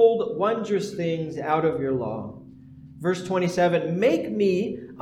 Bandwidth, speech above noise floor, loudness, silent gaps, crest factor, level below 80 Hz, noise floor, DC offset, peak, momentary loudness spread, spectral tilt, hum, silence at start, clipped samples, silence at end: 13 kHz; 22 dB; -25 LUFS; none; 16 dB; -62 dBFS; -45 dBFS; under 0.1%; -8 dBFS; 9 LU; -6.5 dB/octave; none; 0 s; under 0.1%; 0 s